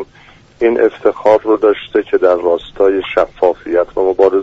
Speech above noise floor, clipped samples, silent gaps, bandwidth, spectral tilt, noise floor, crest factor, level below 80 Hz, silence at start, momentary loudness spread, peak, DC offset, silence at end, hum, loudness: 31 dB; under 0.1%; none; 7.6 kHz; -6.5 dB/octave; -43 dBFS; 14 dB; -46 dBFS; 0 s; 5 LU; 0 dBFS; under 0.1%; 0 s; none; -13 LUFS